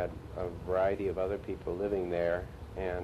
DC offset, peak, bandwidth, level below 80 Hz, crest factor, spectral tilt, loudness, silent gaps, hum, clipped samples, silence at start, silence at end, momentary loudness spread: under 0.1%; -18 dBFS; 13 kHz; -48 dBFS; 16 dB; -8 dB/octave; -34 LUFS; none; none; under 0.1%; 0 s; 0 s; 8 LU